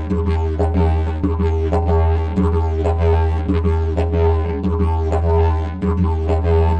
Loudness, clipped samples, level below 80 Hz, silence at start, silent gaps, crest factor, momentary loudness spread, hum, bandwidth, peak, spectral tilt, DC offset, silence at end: -18 LUFS; under 0.1%; -20 dBFS; 0 s; none; 12 dB; 3 LU; none; 4.8 kHz; -6 dBFS; -9.5 dB/octave; under 0.1%; 0 s